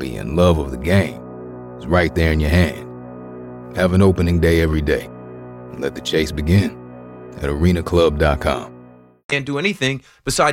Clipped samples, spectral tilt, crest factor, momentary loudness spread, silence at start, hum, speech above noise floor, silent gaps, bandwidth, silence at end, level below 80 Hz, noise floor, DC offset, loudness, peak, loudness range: under 0.1%; -6 dB/octave; 16 dB; 19 LU; 0 s; none; 27 dB; 9.24-9.29 s; 16.5 kHz; 0 s; -30 dBFS; -44 dBFS; under 0.1%; -18 LUFS; -2 dBFS; 2 LU